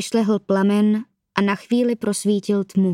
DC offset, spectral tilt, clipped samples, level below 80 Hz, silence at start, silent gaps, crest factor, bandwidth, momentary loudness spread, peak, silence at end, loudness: under 0.1%; -6 dB/octave; under 0.1%; -66 dBFS; 0 s; none; 18 dB; 13.5 kHz; 4 LU; 0 dBFS; 0 s; -20 LUFS